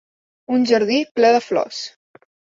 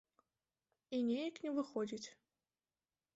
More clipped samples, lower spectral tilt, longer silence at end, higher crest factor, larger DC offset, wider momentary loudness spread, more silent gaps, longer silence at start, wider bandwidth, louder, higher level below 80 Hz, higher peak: neither; about the same, -4 dB/octave vs -4.5 dB/octave; second, 0.65 s vs 1.05 s; about the same, 16 dB vs 16 dB; neither; first, 13 LU vs 9 LU; first, 1.11-1.15 s vs none; second, 0.5 s vs 0.9 s; about the same, 7.8 kHz vs 8 kHz; first, -18 LUFS vs -41 LUFS; first, -68 dBFS vs -86 dBFS; first, -4 dBFS vs -28 dBFS